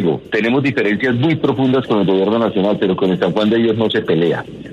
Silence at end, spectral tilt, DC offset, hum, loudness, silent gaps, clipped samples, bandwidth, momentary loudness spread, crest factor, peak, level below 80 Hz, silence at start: 0 s; -8 dB/octave; under 0.1%; none; -16 LUFS; none; under 0.1%; 8.4 kHz; 2 LU; 12 dB; -2 dBFS; -52 dBFS; 0 s